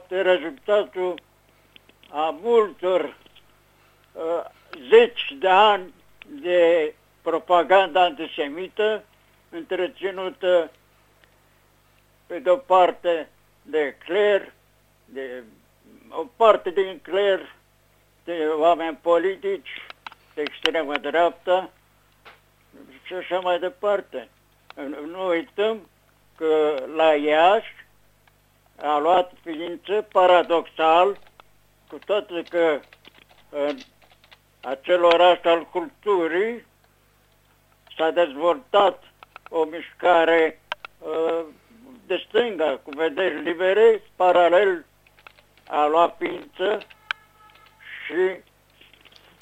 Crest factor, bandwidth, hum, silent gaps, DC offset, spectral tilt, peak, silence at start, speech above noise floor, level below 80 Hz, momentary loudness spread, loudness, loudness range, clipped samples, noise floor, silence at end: 22 dB; 9.2 kHz; 50 Hz at -65 dBFS; none; under 0.1%; -4.5 dB/octave; 0 dBFS; 0.1 s; 39 dB; -66 dBFS; 18 LU; -22 LUFS; 6 LU; under 0.1%; -60 dBFS; 1.05 s